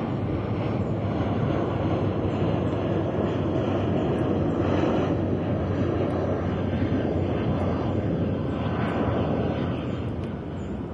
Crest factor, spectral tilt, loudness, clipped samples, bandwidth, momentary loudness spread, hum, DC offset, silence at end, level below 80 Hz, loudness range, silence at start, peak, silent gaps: 14 dB; -9 dB/octave; -26 LUFS; under 0.1%; 7.4 kHz; 3 LU; none; under 0.1%; 0 s; -44 dBFS; 1 LU; 0 s; -12 dBFS; none